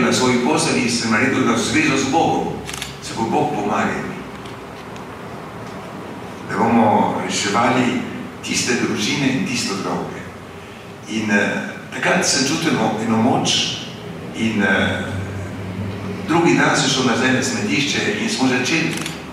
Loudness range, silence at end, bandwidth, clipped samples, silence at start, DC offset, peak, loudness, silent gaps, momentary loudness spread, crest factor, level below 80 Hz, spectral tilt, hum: 5 LU; 0 s; 15.5 kHz; under 0.1%; 0 s; under 0.1%; -2 dBFS; -18 LUFS; none; 16 LU; 16 dB; -50 dBFS; -4 dB/octave; none